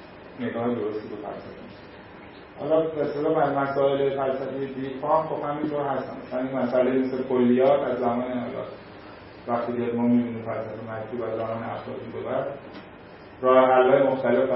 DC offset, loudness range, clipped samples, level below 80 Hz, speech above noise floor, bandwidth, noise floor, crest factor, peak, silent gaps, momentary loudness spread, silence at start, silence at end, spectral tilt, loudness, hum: under 0.1%; 5 LU; under 0.1%; -60 dBFS; 20 dB; 5.8 kHz; -45 dBFS; 20 dB; -4 dBFS; none; 23 LU; 0 s; 0 s; -11 dB/octave; -25 LUFS; none